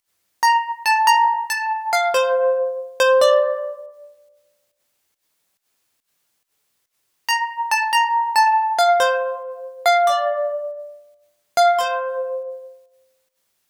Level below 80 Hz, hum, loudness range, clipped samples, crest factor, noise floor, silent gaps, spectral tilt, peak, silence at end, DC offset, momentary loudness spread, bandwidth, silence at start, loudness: -72 dBFS; none; 9 LU; under 0.1%; 16 dB; -71 dBFS; none; 2 dB/octave; -4 dBFS; 0.95 s; under 0.1%; 15 LU; over 20 kHz; 0.4 s; -18 LUFS